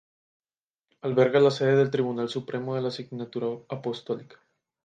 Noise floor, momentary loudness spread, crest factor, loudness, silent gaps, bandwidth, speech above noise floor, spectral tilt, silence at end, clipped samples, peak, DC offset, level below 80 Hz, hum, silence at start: under -90 dBFS; 14 LU; 20 dB; -26 LUFS; none; 9 kHz; over 64 dB; -7 dB/octave; 0.6 s; under 0.1%; -8 dBFS; under 0.1%; -74 dBFS; none; 1.05 s